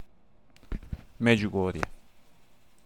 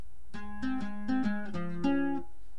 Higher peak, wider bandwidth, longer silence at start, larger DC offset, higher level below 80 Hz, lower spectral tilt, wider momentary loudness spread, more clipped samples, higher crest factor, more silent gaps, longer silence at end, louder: first, -8 dBFS vs -18 dBFS; first, 13.5 kHz vs 10 kHz; about the same, 0 s vs 0.05 s; second, 0.2% vs 2%; first, -46 dBFS vs -54 dBFS; about the same, -6.5 dB/octave vs -7.5 dB/octave; first, 19 LU vs 14 LU; neither; first, 24 dB vs 16 dB; neither; first, 0.9 s vs 0 s; first, -28 LUFS vs -34 LUFS